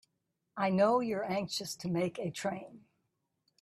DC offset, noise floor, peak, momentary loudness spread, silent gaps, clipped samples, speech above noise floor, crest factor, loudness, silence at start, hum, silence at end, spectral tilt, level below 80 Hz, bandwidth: under 0.1%; -83 dBFS; -16 dBFS; 14 LU; none; under 0.1%; 50 dB; 20 dB; -33 LUFS; 0.55 s; none; 0.85 s; -5.5 dB/octave; -74 dBFS; 14 kHz